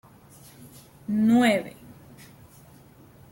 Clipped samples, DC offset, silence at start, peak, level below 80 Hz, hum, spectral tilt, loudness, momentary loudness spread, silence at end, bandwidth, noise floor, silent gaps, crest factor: under 0.1%; under 0.1%; 1.1 s; -10 dBFS; -62 dBFS; none; -5.5 dB/octave; -22 LUFS; 27 LU; 1.65 s; 16.5 kHz; -52 dBFS; none; 18 dB